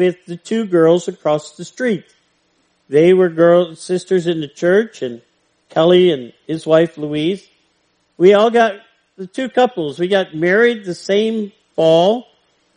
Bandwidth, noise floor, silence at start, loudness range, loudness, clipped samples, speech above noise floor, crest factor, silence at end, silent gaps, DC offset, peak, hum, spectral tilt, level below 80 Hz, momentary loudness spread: 10 kHz; -62 dBFS; 0 s; 2 LU; -15 LUFS; under 0.1%; 48 dB; 16 dB; 0.55 s; none; under 0.1%; 0 dBFS; none; -6 dB/octave; -66 dBFS; 13 LU